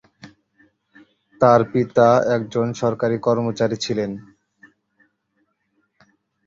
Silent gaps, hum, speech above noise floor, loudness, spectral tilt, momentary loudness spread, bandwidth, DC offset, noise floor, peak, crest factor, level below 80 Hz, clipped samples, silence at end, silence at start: none; none; 51 dB; -19 LUFS; -6.5 dB/octave; 9 LU; 7.6 kHz; under 0.1%; -69 dBFS; -2 dBFS; 20 dB; -58 dBFS; under 0.1%; 2.25 s; 0.25 s